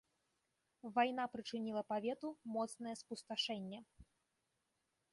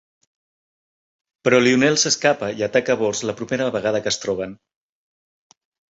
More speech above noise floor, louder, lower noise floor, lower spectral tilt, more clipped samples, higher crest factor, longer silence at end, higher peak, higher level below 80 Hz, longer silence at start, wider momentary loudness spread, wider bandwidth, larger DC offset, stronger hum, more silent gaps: second, 44 dB vs over 71 dB; second, -42 LUFS vs -19 LUFS; second, -86 dBFS vs under -90 dBFS; about the same, -4 dB/octave vs -3.5 dB/octave; neither; about the same, 20 dB vs 20 dB; second, 1.1 s vs 1.4 s; second, -24 dBFS vs -2 dBFS; second, -78 dBFS vs -60 dBFS; second, 0.85 s vs 1.45 s; about the same, 12 LU vs 10 LU; first, 11.5 kHz vs 8 kHz; neither; neither; neither